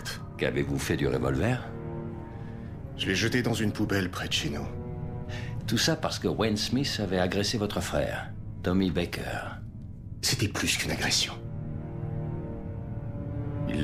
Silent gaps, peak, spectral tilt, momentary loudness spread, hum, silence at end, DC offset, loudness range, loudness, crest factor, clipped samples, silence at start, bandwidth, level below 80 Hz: none; -12 dBFS; -4.5 dB/octave; 12 LU; none; 0 s; under 0.1%; 2 LU; -29 LUFS; 18 dB; under 0.1%; 0 s; 16 kHz; -44 dBFS